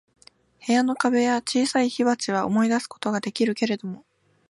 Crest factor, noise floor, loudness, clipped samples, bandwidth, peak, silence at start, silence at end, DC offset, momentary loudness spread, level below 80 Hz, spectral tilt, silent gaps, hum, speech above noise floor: 18 dB; -52 dBFS; -23 LUFS; under 0.1%; 11.5 kHz; -6 dBFS; 0.65 s; 0.5 s; under 0.1%; 8 LU; -70 dBFS; -4.5 dB/octave; none; none; 30 dB